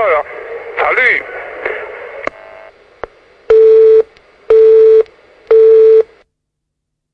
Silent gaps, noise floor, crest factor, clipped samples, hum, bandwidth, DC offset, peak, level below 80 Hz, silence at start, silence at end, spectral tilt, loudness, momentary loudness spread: none; -74 dBFS; 10 dB; under 0.1%; none; 4.7 kHz; under 0.1%; 0 dBFS; -50 dBFS; 0 s; 1.1 s; -4.5 dB/octave; -9 LUFS; 19 LU